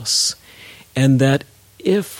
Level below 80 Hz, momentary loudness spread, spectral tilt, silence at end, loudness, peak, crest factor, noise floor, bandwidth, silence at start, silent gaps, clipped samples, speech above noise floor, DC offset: -56 dBFS; 12 LU; -4.5 dB/octave; 0 s; -18 LUFS; -4 dBFS; 14 dB; -42 dBFS; 17 kHz; 0 s; none; under 0.1%; 26 dB; under 0.1%